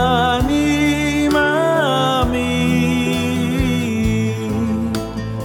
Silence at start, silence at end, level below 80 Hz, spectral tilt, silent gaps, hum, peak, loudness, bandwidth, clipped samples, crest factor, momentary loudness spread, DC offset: 0 s; 0 s; -32 dBFS; -5.5 dB/octave; none; none; -2 dBFS; -17 LUFS; 18.5 kHz; under 0.1%; 14 dB; 5 LU; under 0.1%